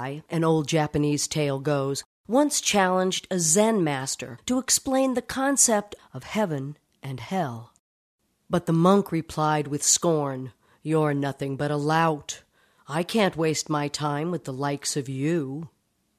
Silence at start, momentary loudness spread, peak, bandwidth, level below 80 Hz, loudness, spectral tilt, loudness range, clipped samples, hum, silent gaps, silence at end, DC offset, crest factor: 0 s; 14 LU; -4 dBFS; 14 kHz; -60 dBFS; -24 LUFS; -4 dB/octave; 4 LU; under 0.1%; none; 2.05-2.24 s, 7.79-8.18 s; 0.5 s; under 0.1%; 20 dB